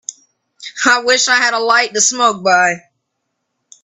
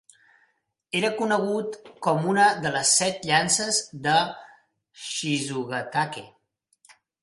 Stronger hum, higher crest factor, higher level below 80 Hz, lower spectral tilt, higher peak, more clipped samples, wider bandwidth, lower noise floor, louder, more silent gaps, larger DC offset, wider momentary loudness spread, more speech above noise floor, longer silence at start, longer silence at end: neither; about the same, 16 dB vs 20 dB; about the same, -66 dBFS vs -68 dBFS; second, -0.5 dB/octave vs -2.5 dB/octave; first, 0 dBFS vs -6 dBFS; neither; first, 13 kHz vs 11.5 kHz; about the same, -72 dBFS vs -70 dBFS; first, -12 LUFS vs -24 LUFS; neither; neither; first, 17 LU vs 12 LU; first, 59 dB vs 46 dB; second, 0.1 s vs 0.95 s; about the same, 1.05 s vs 0.95 s